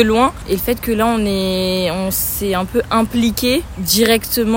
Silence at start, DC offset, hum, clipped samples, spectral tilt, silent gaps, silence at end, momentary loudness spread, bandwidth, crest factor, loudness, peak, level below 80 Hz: 0 s; under 0.1%; none; under 0.1%; -4 dB/octave; none; 0 s; 5 LU; 16.5 kHz; 16 dB; -16 LUFS; 0 dBFS; -34 dBFS